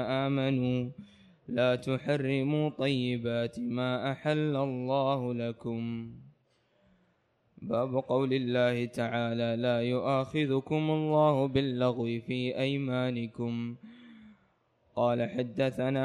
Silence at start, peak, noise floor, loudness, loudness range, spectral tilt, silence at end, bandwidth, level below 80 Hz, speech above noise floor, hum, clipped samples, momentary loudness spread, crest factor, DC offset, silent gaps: 0 s; -14 dBFS; -72 dBFS; -30 LUFS; 5 LU; -7.5 dB/octave; 0 s; 11 kHz; -66 dBFS; 42 dB; none; under 0.1%; 7 LU; 16 dB; under 0.1%; none